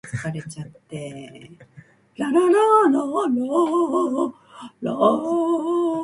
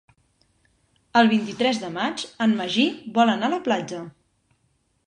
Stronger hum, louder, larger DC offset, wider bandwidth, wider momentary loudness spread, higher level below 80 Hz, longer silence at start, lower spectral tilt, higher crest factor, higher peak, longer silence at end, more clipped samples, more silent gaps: neither; about the same, -20 LUFS vs -22 LUFS; neither; first, 11.5 kHz vs 10 kHz; first, 20 LU vs 8 LU; about the same, -64 dBFS vs -68 dBFS; second, 0.05 s vs 1.15 s; first, -6.5 dB/octave vs -4.5 dB/octave; about the same, 18 dB vs 20 dB; about the same, -4 dBFS vs -4 dBFS; second, 0 s vs 0.95 s; neither; neither